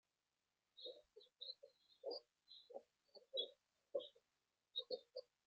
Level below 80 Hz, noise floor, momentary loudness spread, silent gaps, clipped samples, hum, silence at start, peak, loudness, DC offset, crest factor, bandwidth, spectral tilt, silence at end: under -90 dBFS; under -90 dBFS; 20 LU; none; under 0.1%; none; 0.75 s; -32 dBFS; -52 LUFS; under 0.1%; 24 dB; 7.6 kHz; 0.5 dB/octave; 0.25 s